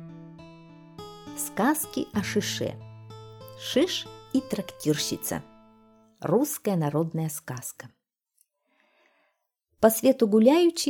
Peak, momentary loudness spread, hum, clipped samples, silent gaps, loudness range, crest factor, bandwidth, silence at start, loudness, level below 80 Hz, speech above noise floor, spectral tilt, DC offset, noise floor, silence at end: -6 dBFS; 24 LU; none; under 0.1%; none; 3 LU; 22 dB; 19.5 kHz; 0 s; -26 LUFS; -64 dBFS; 51 dB; -4.5 dB/octave; under 0.1%; -76 dBFS; 0 s